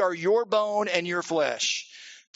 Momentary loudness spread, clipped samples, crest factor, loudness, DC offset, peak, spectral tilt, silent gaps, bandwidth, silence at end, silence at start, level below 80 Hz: 9 LU; under 0.1%; 18 dB; -25 LUFS; under 0.1%; -8 dBFS; -1.5 dB/octave; none; 8 kHz; 0.2 s; 0 s; -78 dBFS